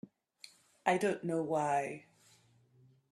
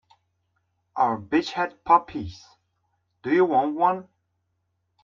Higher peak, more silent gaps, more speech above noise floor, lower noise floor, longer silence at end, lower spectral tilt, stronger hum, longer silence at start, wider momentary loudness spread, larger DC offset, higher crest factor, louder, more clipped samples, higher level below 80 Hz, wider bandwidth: second, -14 dBFS vs -4 dBFS; neither; second, 34 dB vs 52 dB; second, -67 dBFS vs -75 dBFS; about the same, 1.1 s vs 1 s; about the same, -5.5 dB/octave vs -6 dB/octave; neither; about the same, 0.85 s vs 0.95 s; first, 23 LU vs 15 LU; neither; about the same, 24 dB vs 22 dB; second, -34 LUFS vs -23 LUFS; neither; second, -80 dBFS vs -62 dBFS; first, 13 kHz vs 7.4 kHz